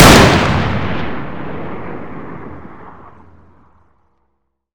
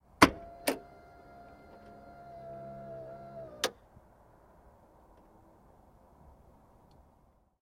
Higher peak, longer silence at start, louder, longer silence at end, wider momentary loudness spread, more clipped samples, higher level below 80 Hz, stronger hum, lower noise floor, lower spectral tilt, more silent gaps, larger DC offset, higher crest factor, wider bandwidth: first, 0 dBFS vs -4 dBFS; second, 0 s vs 0.2 s; first, -14 LUFS vs -33 LUFS; second, 0 s vs 3.9 s; second, 25 LU vs 29 LU; first, 1% vs under 0.1%; first, -28 dBFS vs -60 dBFS; neither; about the same, -68 dBFS vs -66 dBFS; about the same, -4.5 dB/octave vs -3.5 dB/octave; neither; neither; second, 16 dB vs 34 dB; first, over 20 kHz vs 16 kHz